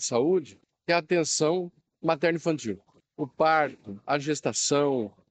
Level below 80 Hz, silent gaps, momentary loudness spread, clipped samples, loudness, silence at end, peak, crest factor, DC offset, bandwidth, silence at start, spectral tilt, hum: -72 dBFS; none; 13 LU; under 0.1%; -27 LUFS; 0.2 s; -8 dBFS; 18 dB; under 0.1%; 9.4 kHz; 0 s; -4 dB/octave; none